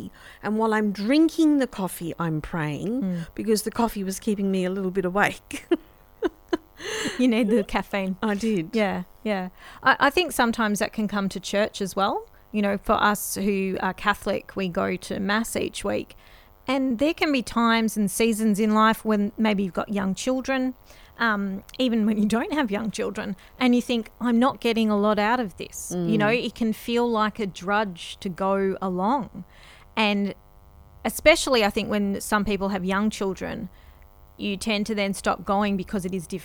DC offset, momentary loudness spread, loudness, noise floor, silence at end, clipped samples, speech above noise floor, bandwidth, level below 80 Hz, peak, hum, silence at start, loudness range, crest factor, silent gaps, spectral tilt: under 0.1%; 10 LU; -24 LUFS; -50 dBFS; 0 s; under 0.1%; 26 dB; 19.5 kHz; -48 dBFS; -2 dBFS; none; 0 s; 4 LU; 22 dB; none; -5 dB/octave